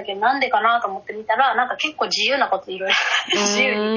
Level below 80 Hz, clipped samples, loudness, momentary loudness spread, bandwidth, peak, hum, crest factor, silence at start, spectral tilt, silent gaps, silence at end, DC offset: -68 dBFS; under 0.1%; -19 LUFS; 6 LU; 7.2 kHz; -4 dBFS; none; 16 dB; 0 s; -1.5 dB/octave; none; 0 s; under 0.1%